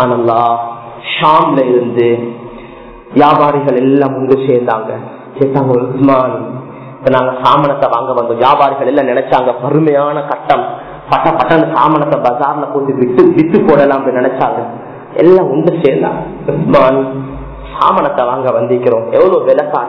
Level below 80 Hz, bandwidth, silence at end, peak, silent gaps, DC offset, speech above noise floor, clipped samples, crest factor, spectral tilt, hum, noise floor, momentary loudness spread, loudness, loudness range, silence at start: -42 dBFS; 5.4 kHz; 0 s; 0 dBFS; none; under 0.1%; 21 dB; 1%; 10 dB; -9.5 dB/octave; none; -31 dBFS; 14 LU; -11 LUFS; 2 LU; 0 s